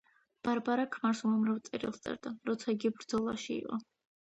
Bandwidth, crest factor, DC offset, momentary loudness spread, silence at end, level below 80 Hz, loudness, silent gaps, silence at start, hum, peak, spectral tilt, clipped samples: 8.2 kHz; 16 dB; under 0.1%; 9 LU; 0.5 s; -72 dBFS; -35 LUFS; none; 0.45 s; none; -18 dBFS; -5.5 dB/octave; under 0.1%